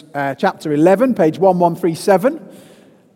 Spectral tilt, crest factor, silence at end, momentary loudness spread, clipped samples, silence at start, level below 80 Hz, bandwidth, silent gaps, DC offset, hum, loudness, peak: -7 dB/octave; 16 dB; 0.65 s; 7 LU; under 0.1%; 0.15 s; -64 dBFS; 16.5 kHz; none; under 0.1%; none; -15 LUFS; 0 dBFS